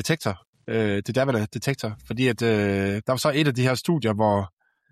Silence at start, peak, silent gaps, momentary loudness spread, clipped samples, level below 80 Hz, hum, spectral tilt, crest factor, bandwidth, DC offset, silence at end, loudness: 0 s; -8 dBFS; 0.47-0.53 s; 9 LU; under 0.1%; -58 dBFS; none; -5.5 dB/octave; 16 dB; 14.5 kHz; under 0.1%; 0.45 s; -24 LUFS